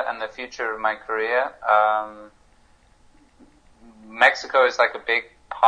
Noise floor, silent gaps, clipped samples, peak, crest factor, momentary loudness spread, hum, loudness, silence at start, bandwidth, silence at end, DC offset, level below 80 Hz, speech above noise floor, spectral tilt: -56 dBFS; none; under 0.1%; 0 dBFS; 24 dB; 13 LU; none; -21 LUFS; 0 s; 9.8 kHz; 0 s; under 0.1%; -60 dBFS; 34 dB; -1.5 dB/octave